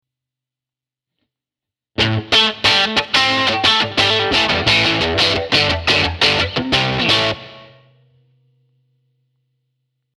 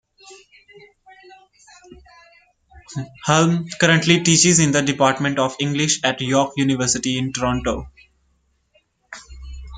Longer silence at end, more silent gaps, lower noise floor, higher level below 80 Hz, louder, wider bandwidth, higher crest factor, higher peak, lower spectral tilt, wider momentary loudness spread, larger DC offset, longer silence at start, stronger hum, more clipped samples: first, 2.5 s vs 0 s; neither; first, -88 dBFS vs -65 dBFS; about the same, -40 dBFS vs -44 dBFS; first, -14 LUFS vs -18 LUFS; first, 13.5 kHz vs 9.6 kHz; about the same, 18 dB vs 20 dB; about the same, 0 dBFS vs 0 dBFS; about the same, -3.5 dB/octave vs -3.5 dB/octave; second, 5 LU vs 21 LU; neither; first, 2 s vs 0.25 s; neither; neither